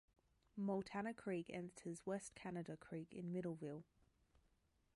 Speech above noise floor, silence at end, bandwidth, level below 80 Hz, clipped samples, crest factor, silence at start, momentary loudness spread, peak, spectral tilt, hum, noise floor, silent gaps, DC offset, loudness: 33 dB; 1.1 s; 11.5 kHz; -80 dBFS; under 0.1%; 16 dB; 0.55 s; 8 LU; -32 dBFS; -6.5 dB/octave; none; -81 dBFS; none; under 0.1%; -49 LUFS